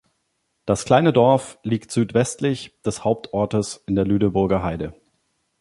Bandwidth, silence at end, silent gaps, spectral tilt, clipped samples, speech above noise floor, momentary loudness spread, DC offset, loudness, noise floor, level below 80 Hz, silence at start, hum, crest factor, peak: 11.5 kHz; 0.7 s; none; -6 dB/octave; under 0.1%; 52 dB; 11 LU; under 0.1%; -21 LUFS; -72 dBFS; -46 dBFS; 0.65 s; none; 20 dB; -2 dBFS